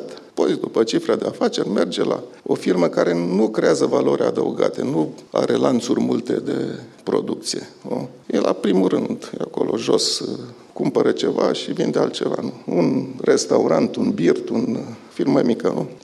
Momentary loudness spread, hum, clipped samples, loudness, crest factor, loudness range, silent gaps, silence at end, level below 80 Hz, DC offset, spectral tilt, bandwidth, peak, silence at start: 9 LU; none; under 0.1%; -20 LUFS; 18 dB; 3 LU; none; 0.05 s; -68 dBFS; under 0.1%; -5 dB/octave; 12.5 kHz; -2 dBFS; 0 s